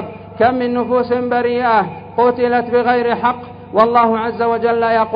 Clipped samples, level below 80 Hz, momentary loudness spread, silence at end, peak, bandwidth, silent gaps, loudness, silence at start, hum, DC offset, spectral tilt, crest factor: under 0.1%; -50 dBFS; 5 LU; 0 s; 0 dBFS; 5.2 kHz; none; -15 LUFS; 0 s; 50 Hz at -45 dBFS; under 0.1%; -8.5 dB/octave; 16 dB